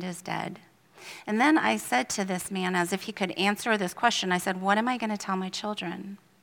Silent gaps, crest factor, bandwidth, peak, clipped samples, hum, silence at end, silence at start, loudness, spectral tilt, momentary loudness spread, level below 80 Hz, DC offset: none; 22 dB; 18 kHz; -6 dBFS; under 0.1%; none; 0.25 s; 0 s; -27 LUFS; -4 dB/octave; 12 LU; -72 dBFS; under 0.1%